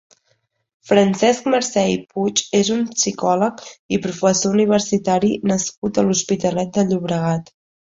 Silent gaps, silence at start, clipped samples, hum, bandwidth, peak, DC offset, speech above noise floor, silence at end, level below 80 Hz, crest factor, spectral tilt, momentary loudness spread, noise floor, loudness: 3.79-3.89 s, 5.77-5.82 s; 0.85 s; under 0.1%; none; 8 kHz; -2 dBFS; under 0.1%; 48 dB; 0.5 s; -56 dBFS; 16 dB; -4.5 dB/octave; 6 LU; -66 dBFS; -18 LUFS